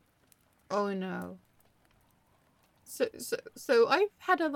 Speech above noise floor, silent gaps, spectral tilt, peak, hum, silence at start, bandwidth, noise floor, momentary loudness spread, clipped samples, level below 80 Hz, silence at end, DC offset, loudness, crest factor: 38 dB; none; -4.5 dB/octave; -14 dBFS; none; 0.7 s; 17 kHz; -68 dBFS; 14 LU; under 0.1%; -78 dBFS; 0 s; under 0.1%; -31 LUFS; 20 dB